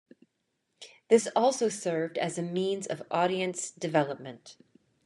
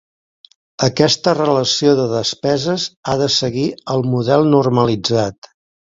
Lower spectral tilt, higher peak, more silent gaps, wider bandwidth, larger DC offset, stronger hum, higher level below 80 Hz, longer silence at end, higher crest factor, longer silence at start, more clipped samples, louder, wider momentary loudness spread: about the same, -4.5 dB/octave vs -5 dB/octave; second, -8 dBFS vs 0 dBFS; second, none vs 2.97-3.03 s; first, 12 kHz vs 7.8 kHz; neither; neither; second, -82 dBFS vs -52 dBFS; about the same, 0.55 s vs 0.6 s; first, 22 dB vs 16 dB; about the same, 0.8 s vs 0.8 s; neither; second, -29 LUFS vs -16 LUFS; first, 17 LU vs 7 LU